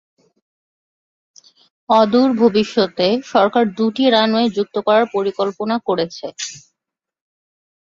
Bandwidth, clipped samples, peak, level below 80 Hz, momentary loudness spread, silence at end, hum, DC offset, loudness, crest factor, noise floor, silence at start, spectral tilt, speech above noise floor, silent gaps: 7.6 kHz; under 0.1%; -2 dBFS; -62 dBFS; 9 LU; 1.25 s; none; under 0.1%; -16 LUFS; 16 dB; -84 dBFS; 1.9 s; -5 dB/octave; 68 dB; none